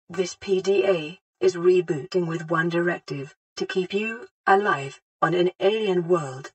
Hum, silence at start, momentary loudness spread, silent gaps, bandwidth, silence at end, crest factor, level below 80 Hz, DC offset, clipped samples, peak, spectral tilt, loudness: none; 0.1 s; 10 LU; 1.21-1.33 s, 3.36-3.56 s, 4.31-4.44 s, 5.02-5.19 s, 5.55-5.59 s; 8.6 kHz; 0.05 s; 20 dB; -72 dBFS; under 0.1%; under 0.1%; -4 dBFS; -5.5 dB/octave; -24 LUFS